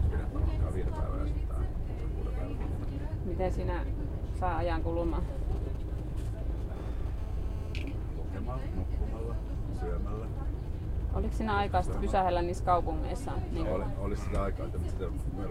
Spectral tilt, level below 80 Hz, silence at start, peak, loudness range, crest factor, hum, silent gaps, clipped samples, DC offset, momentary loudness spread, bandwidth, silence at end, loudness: -7.5 dB/octave; -34 dBFS; 0 s; -14 dBFS; 6 LU; 18 dB; none; none; under 0.1%; under 0.1%; 8 LU; 11 kHz; 0 s; -34 LUFS